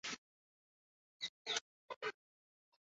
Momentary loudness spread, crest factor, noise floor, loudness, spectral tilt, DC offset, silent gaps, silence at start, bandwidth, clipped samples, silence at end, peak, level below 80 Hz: 9 LU; 26 dB; under -90 dBFS; -45 LUFS; 1.5 dB/octave; under 0.1%; 0.18-1.20 s, 1.29-1.45 s, 1.61-1.89 s, 1.96-2.01 s; 0.05 s; 7.6 kHz; under 0.1%; 0.8 s; -24 dBFS; under -90 dBFS